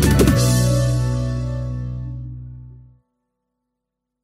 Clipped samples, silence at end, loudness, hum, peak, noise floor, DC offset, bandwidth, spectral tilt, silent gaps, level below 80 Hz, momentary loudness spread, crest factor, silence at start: under 0.1%; 1.45 s; -19 LUFS; none; -2 dBFS; -80 dBFS; under 0.1%; 16 kHz; -6 dB/octave; none; -28 dBFS; 20 LU; 18 dB; 0 s